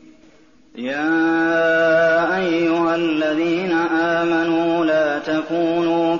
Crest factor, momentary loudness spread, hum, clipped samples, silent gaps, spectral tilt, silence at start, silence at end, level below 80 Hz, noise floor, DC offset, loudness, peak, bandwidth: 12 dB; 5 LU; none; under 0.1%; none; -3.5 dB/octave; 0.75 s; 0 s; -60 dBFS; -51 dBFS; 0.2%; -18 LUFS; -8 dBFS; 7.2 kHz